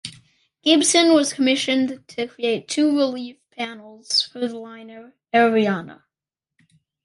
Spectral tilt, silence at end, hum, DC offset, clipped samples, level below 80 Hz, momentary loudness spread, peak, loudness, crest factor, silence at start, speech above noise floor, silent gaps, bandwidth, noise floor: -2.5 dB/octave; 1.1 s; none; under 0.1%; under 0.1%; -70 dBFS; 20 LU; -4 dBFS; -20 LUFS; 18 dB; 0.05 s; 68 dB; none; 11.5 kHz; -88 dBFS